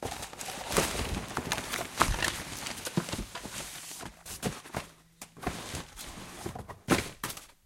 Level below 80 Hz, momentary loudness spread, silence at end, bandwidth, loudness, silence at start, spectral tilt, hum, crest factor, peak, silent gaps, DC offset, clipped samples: -46 dBFS; 13 LU; 0.15 s; 17 kHz; -34 LUFS; 0 s; -3 dB/octave; none; 32 dB; -4 dBFS; none; under 0.1%; under 0.1%